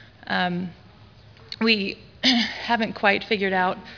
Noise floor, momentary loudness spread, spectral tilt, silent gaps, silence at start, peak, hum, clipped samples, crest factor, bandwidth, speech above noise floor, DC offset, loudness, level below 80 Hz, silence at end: -49 dBFS; 11 LU; -4.5 dB/octave; none; 0.25 s; -4 dBFS; none; under 0.1%; 22 dB; 5.4 kHz; 26 dB; under 0.1%; -22 LUFS; -58 dBFS; 0 s